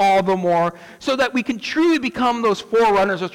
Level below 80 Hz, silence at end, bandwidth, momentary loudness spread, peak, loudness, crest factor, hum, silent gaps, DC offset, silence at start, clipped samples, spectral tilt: -52 dBFS; 0.05 s; 16.5 kHz; 7 LU; -10 dBFS; -19 LUFS; 8 dB; none; none; under 0.1%; 0 s; under 0.1%; -5 dB/octave